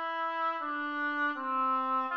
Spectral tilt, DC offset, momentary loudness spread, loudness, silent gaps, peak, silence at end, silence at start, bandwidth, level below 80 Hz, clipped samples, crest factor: -3.5 dB/octave; under 0.1%; 4 LU; -31 LUFS; none; -20 dBFS; 0 s; 0 s; 6.6 kHz; -88 dBFS; under 0.1%; 12 dB